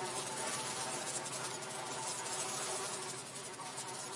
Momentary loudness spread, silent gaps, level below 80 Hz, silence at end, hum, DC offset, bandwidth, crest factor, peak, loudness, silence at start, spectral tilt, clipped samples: 6 LU; none; -82 dBFS; 0 s; none; under 0.1%; 11.5 kHz; 18 dB; -24 dBFS; -39 LUFS; 0 s; -1.5 dB/octave; under 0.1%